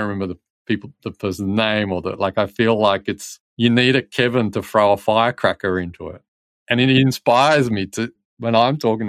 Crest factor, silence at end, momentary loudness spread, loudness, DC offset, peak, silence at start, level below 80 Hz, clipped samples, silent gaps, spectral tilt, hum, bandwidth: 16 dB; 0 s; 13 LU; -18 LUFS; under 0.1%; -2 dBFS; 0 s; -58 dBFS; under 0.1%; 0.50-0.65 s, 3.40-3.57 s, 6.28-6.66 s, 8.25-8.37 s; -5.5 dB/octave; none; 15.5 kHz